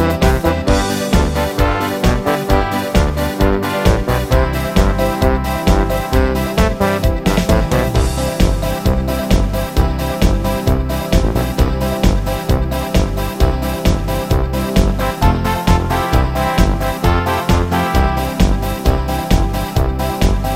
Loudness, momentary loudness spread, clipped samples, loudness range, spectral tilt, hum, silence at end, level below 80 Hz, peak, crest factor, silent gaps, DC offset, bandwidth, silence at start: -16 LUFS; 3 LU; under 0.1%; 1 LU; -6 dB/octave; none; 0 s; -18 dBFS; 0 dBFS; 14 dB; none; under 0.1%; 16.5 kHz; 0 s